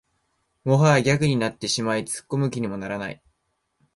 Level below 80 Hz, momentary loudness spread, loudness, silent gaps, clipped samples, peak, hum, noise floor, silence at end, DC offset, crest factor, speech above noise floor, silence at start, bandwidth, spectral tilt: -56 dBFS; 13 LU; -23 LUFS; none; under 0.1%; -4 dBFS; none; -74 dBFS; 0.8 s; under 0.1%; 20 dB; 51 dB; 0.65 s; 11.5 kHz; -5.5 dB/octave